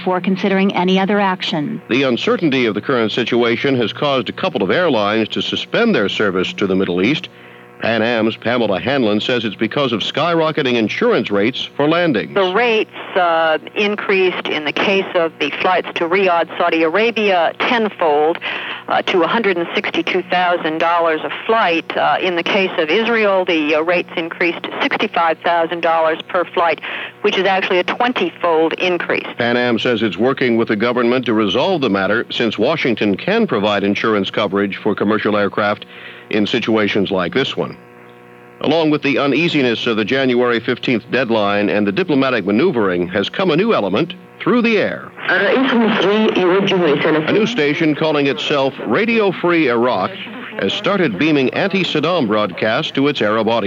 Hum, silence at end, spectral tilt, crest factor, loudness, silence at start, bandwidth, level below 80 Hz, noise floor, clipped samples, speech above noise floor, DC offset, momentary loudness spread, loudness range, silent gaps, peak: none; 0 s; -6 dB/octave; 12 dB; -16 LUFS; 0 s; 7.8 kHz; -64 dBFS; -41 dBFS; under 0.1%; 25 dB; under 0.1%; 4 LU; 2 LU; none; -4 dBFS